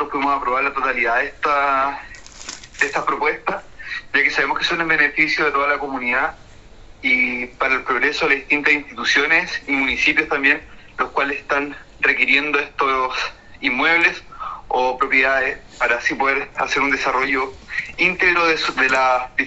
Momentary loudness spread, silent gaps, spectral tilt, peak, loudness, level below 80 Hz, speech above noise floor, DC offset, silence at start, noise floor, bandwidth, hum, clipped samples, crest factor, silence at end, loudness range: 11 LU; none; -3 dB/octave; 0 dBFS; -18 LUFS; -46 dBFS; 22 dB; under 0.1%; 0 s; -42 dBFS; 8.2 kHz; none; under 0.1%; 20 dB; 0 s; 3 LU